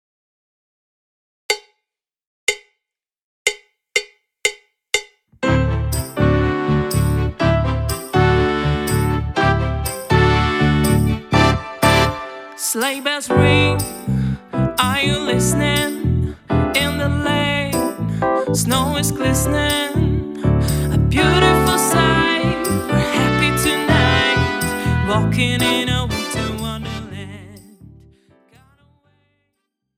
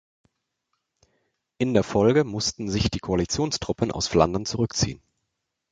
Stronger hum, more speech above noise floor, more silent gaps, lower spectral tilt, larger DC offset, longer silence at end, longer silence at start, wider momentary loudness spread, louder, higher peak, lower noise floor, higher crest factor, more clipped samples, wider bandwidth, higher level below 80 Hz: neither; first, 67 dB vs 57 dB; first, 2.27-2.47 s, 3.24-3.45 s vs none; about the same, -4.5 dB/octave vs -5 dB/octave; neither; first, 2.1 s vs 0.75 s; about the same, 1.5 s vs 1.6 s; about the same, 8 LU vs 7 LU; first, -17 LUFS vs -24 LUFS; about the same, 0 dBFS vs -2 dBFS; about the same, -83 dBFS vs -80 dBFS; second, 18 dB vs 24 dB; neither; first, 17.5 kHz vs 9.4 kHz; first, -30 dBFS vs -44 dBFS